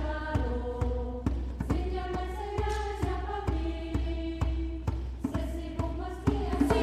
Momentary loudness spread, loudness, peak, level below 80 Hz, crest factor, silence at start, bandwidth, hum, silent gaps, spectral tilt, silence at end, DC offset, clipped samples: 4 LU; -33 LUFS; -12 dBFS; -34 dBFS; 18 dB; 0 s; 11.5 kHz; none; none; -7.5 dB/octave; 0 s; under 0.1%; under 0.1%